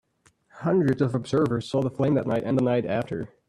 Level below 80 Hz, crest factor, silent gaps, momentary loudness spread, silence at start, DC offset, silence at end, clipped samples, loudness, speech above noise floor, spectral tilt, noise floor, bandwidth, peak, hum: -58 dBFS; 14 dB; none; 5 LU; 0.55 s; under 0.1%; 0.25 s; under 0.1%; -25 LUFS; 39 dB; -8 dB/octave; -63 dBFS; 11.5 kHz; -10 dBFS; none